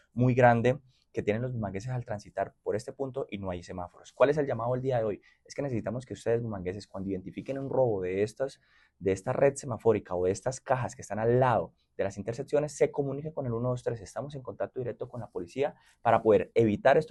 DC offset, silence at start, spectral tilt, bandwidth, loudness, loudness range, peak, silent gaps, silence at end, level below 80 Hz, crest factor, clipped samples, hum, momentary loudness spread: under 0.1%; 0.15 s; -7 dB/octave; 11.5 kHz; -30 LUFS; 4 LU; -8 dBFS; none; 0 s; -60 dBFS; 20 dB; under 0.1%; none; 13 LU